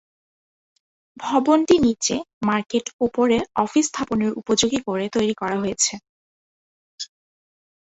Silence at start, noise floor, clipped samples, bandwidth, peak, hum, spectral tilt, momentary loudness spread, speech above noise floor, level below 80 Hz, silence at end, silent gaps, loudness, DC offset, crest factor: 1.2 s; under -90 dBFS; under 0.1%; 8.2 kHz; -4 dBFS; none; -3.5 dB/octave; 13 LU; over 69 dB; -54 dBFS; 0.9 s; 2.33-2.41 s, 2.93-2.99 s, 6.09-6.98 s; -21 LUFS; under 0.1%; 20 dB